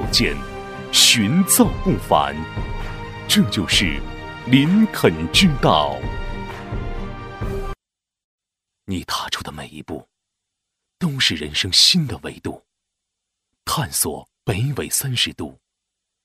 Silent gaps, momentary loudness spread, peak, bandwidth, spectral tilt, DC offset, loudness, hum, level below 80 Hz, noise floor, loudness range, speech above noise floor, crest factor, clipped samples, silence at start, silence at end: 8.24-8.38 s; 19 LU; 0 dBFS; 16 kHz; -3.5 dB/octave; under 0.1%; -18 LUFS; none; -34 dBFS; -86 dBFS; 13 LU; 67 dB; 20 dB; under 0.1%; 0 s; 0.7 s